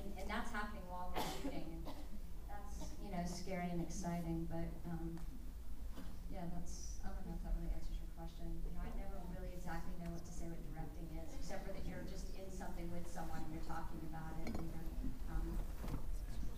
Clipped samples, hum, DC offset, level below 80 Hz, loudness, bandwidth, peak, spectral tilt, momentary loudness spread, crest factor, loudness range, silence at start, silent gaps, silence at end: under 0.1%; none; under 0.1%; -46 dBFS; -48 LUFS; 15.5 kHz; -26 dBFS; -5.5 dB/octave; 8 LU; 16 dB; 4 LU; 0 s; none; 0 s